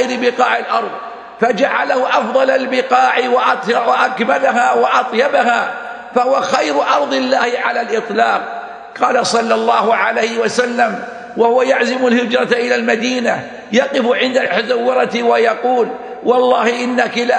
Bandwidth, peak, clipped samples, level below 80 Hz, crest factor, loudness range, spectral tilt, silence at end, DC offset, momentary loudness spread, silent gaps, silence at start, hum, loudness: 10 kHz; 0 dBFS; under 0.1%; -64 dBFS; 14 dB; 2 LU; -3.5 dB/octave; 0 s; under 0.1%; 6 LU; none; 0 s; none; -14 LUFS